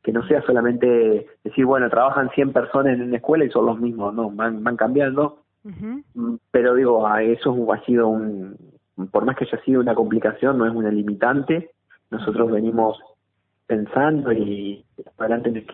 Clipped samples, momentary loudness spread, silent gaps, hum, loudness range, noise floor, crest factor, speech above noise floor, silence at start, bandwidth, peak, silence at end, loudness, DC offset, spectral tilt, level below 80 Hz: under 0.1%; 11 LU; none; none; 4 LU; -72 dBFS; 18 dB; 53 dB; 0.05 s; 4 kHz; -2 dBFS; 0 s; -20 LUFS; under 0.1%; -11.5 dB/octave; -60 dBFS